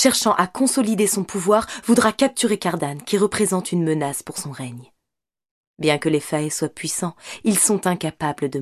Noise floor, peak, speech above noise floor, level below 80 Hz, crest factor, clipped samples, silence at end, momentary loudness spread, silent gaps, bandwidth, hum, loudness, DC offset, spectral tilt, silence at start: -83 dBFS; -2 dBFS; 62 dB; -58 dBFS; 20 dB; under 0.1%; 0 s; 9 LU; 5.51-5.74 s; 14.5 kHz; none; -20 LUFS; under 0.1%; -4 dB/octave; 0 s